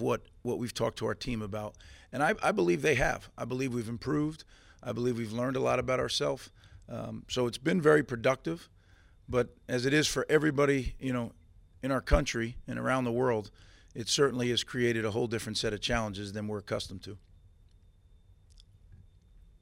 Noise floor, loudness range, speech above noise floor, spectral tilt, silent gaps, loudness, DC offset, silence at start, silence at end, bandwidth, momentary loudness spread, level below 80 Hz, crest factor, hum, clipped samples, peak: -60 dBFS; 5 LU; 29 dB; -5 dB/octave; none; -31 LUFS; under 0.1%; 0 s; 0.65 s; 16 kHz; 14 LU; -48 dBFS; 22 dB; none; under 0.1%; -10 dBFS